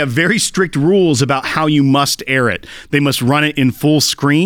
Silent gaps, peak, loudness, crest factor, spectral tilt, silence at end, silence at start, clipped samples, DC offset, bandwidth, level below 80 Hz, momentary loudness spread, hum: none; 0 dBFS; -13 LUFS; 12 dB; -4.5 dB/octave; 0 s; 0 s; under 0.1%; under 0.1%; 18.5 kHz; -48 dBFS; 3 LU; none